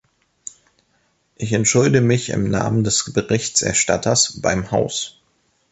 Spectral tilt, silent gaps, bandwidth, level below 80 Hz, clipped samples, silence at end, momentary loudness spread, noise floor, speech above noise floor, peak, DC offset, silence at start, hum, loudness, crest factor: -4 dB/octave; none; 8.6 kHz; -46 dBFS; under 0.1%; 0.6 s; 15 LU; -64 dBFS; 46 dB; -2 dBFS; under 0.1%; 1.4 s; none; -18 LUFS; 18 dB